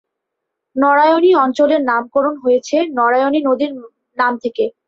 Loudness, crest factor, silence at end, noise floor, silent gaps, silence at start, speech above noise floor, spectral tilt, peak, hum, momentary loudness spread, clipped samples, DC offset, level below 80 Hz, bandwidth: -15 LUFS; 14 dB; 0.15 s; -78 dBFS; none; 0.75 s; 63 dB; -4 dB/octave; -2 dBFS; none; 9 LU; under 0.1%; under 0.1%; -64 dBFS; 7.6 kHz